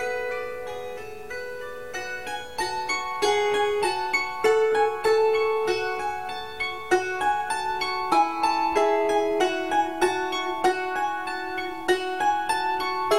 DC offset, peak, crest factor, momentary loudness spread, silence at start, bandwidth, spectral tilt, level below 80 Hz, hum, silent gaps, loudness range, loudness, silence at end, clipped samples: 0.7%; -8 dBFS; 16 dB; 11 LU; 0 s; 16 kHz; -2.5 dB/octave; -58 dBFS; none; none; 4 LU; -25 LUFS; 0 s; under 0.1%